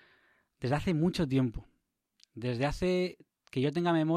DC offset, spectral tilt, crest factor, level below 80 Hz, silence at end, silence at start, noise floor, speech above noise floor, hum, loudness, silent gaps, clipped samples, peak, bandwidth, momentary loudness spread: under 0.1%; -7 dB/octave; 16 dB; -50 dBFS; 0 s; 0.6 s; -77 dBFS; 47 dB; none; -32 LUFS; none; under 0.1%; -16 dBFS; 13 kHz; 10 LU